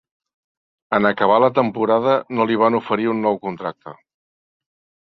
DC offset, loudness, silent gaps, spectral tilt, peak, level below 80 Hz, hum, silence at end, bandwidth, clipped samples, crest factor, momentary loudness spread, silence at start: under 0.1%; -18 LUFS; none; -8 dB/octave; -2 dBFS; -62 dBFS; none; 1.1 s; 6 kHz; under 0.1%; 18 dB; 9 LU; 0.9 s